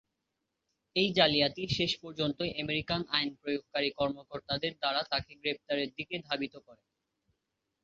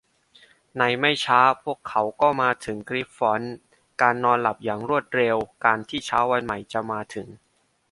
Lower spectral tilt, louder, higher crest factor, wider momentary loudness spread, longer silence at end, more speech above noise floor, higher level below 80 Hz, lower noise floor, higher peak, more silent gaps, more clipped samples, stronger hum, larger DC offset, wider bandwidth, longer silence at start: second, -2 dB/octave vs -4.5 dB/octave; second, -32 LUFS vs -23 LUFS; about the same, 26 dB vs 22 dB; about the same, 10 LU vs 12 LU; first, 1.1 s vs 0.55 s; first, 52 dB vs 33 dB; about the same, -62 dBFS vs -60 dBFS; first, -85 dBFS vs -56 dBFS; second, -8 dBFS vs -2 dBFS; neither; neither; neither; neither; second, 7.6 kHz vs 11.5 kHz; first, 0.95 s vs 0.75 s